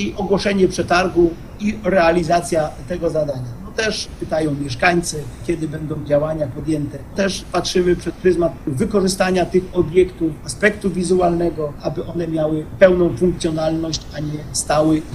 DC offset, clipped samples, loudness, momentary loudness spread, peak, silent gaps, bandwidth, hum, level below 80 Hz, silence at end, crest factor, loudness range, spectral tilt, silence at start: under 0.1%; under 0.1%; -19 LUFS; 9 LU; 0 dBFS; none; 12.5 kHz; none; -38 dBFS; 0 s; 18 dB; 3 LU; -5.5 dB/octave; 0 s